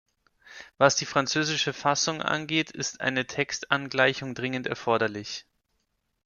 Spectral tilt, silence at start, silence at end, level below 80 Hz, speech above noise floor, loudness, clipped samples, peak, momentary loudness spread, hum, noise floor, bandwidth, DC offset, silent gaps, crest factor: -3 dB/octave; 0.45 s; 0.85 s; -66 dBFS; 49 dB; -26 LUFS; under 0.1%; -4 dBFS; 9 LU; none; -76 dBFS; 10 kHz; under 0.1%; none; 24 dB